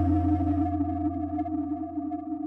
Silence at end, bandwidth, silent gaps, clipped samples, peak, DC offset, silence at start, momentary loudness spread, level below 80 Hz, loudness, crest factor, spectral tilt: 0 s; 3.3 kHz; none; under 0.1%; -16 dBFS; under 0.1%; 0 s; 8 LU; -42 dBFS; -29 LUFS; 12 dB; -12 dB/octave